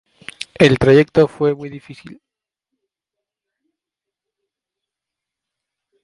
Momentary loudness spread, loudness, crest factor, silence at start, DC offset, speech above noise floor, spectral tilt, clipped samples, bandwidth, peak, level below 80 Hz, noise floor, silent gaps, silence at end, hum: 20 LU; -14 LUFS; 20 dB; 0.6 s; under 0.1%; 71 dB; -6.5 dB/octave; under 0.1%; 11.5 kHz; 0 dBFS; -46 dBFS; -85 dBFS; none; 4.1 s; none